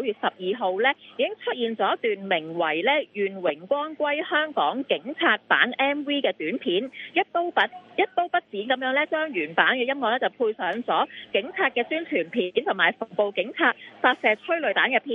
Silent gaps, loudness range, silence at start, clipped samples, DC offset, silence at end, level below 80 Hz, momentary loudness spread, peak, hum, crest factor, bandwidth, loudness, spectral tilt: none; 1 LU; 0 s; under 0.1%; under 0.1%; 0 s; -78 dBFS; 6 LU; -2 dBFS; none; 22 dB; 6 kHz; -24 LUFS; -6 dB/octave